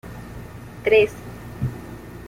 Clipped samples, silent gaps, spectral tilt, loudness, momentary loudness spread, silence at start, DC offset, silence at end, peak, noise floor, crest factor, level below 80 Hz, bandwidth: under 0.1%; none; -6 dB/octave; -21 LUFS; 21 LU; 0.05 s; under 0.1%; 0 s; -4 dBFS; -37 dBFS; 20 dB; -44 dBFS; 16 kHz